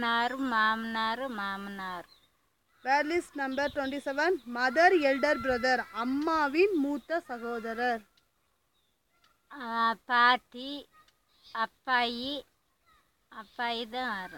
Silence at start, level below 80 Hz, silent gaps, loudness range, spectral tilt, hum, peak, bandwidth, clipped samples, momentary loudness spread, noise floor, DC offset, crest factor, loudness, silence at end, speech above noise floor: 0 s; -66 dBFS; none; 7 LU; -3.5 dB/octave; none; -10 dBFS; 17 kHz; under 0.1%; 16 LU; -75 dBFS; under 0.1%; 20 dB; -29 LUFS; 0 s; 45 dB